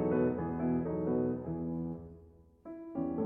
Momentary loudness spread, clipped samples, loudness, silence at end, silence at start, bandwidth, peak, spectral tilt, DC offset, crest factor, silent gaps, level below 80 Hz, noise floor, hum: 17 LU; under 0.1%; -35 LUFS; 0 s; 0 s; 2.9 kHz; -18 dBFS; -12.5 dB/octave; under 0.1%; 16 dB; none; -58 dBFS; -58 dBFS; none